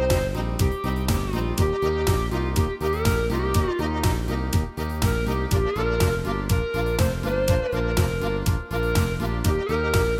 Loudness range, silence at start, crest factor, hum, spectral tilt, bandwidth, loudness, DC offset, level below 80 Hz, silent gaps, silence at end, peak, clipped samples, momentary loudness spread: 1 LU; 0 s; 16 dB; none; -6 dB/octave; 17 kHz; -24 LUFS; under 0.1%; -30 dBFS; none; 0 s; -8 dBFS; under 0.1%; 3 LU